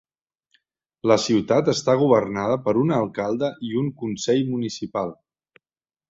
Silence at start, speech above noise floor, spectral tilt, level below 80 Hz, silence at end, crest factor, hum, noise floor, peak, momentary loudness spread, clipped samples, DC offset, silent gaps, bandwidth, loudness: 1.05 s; over 69 dB; -6 dB/octave; -60 dBFS; 1 s; 18 dB; none; under -90 dBFS; -4 dBFS; 9 LU; under 0.1%; under 0.1%; none; 8 kHz; -22 LUFS